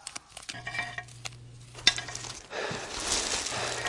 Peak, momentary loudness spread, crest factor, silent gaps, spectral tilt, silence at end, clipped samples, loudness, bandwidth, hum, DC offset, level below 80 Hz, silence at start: -4 dBFS; 17 LU; 30 dB; none; -1 dB/octave; 0 s; under 0.1%; -31 LUFS; 11.5 kHz; none; under 0.1%; -54 dBFS; 0 s